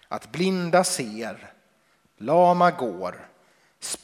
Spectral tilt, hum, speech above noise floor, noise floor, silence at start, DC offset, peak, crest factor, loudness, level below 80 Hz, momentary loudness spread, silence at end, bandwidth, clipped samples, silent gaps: -4.5 dB/octave; none; 42 dB; -64 dBFS; 0.1 s; under 0.1%; -6 dBFS; 20 dB; -23 LUFS; -70 dBFS; 17 LU; 0.05 s; 16 kHz; under 0.1%; none